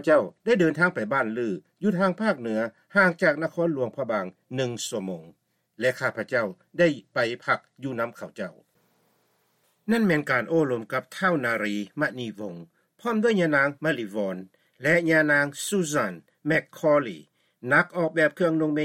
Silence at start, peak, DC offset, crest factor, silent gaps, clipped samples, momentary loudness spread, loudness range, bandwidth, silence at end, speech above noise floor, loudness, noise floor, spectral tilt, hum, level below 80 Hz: 0 s; -6 dBFS; under 0.1%; 18 dB; none; under 0.1%; 13 LU; 5 LU; 16.5 kHz; 0 s; 44 dB; -25 LUFS; -69 dBFS; -5.5 dB/octave; none; -72 dBFS